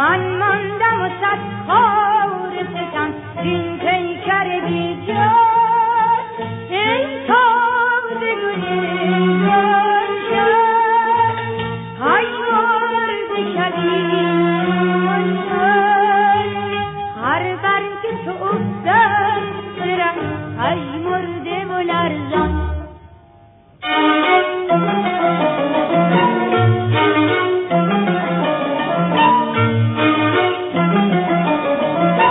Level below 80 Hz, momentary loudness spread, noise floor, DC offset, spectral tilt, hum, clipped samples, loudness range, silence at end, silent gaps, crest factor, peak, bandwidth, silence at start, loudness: -42 dBFS; 9 LU; -46 dBFS; under 0.1%; -10 dB/octave; none; under 0.1%; 3 LU; 0 s; none; 14 dB; -2 dBFS; 4 kHz; 0 s; -17 LUFS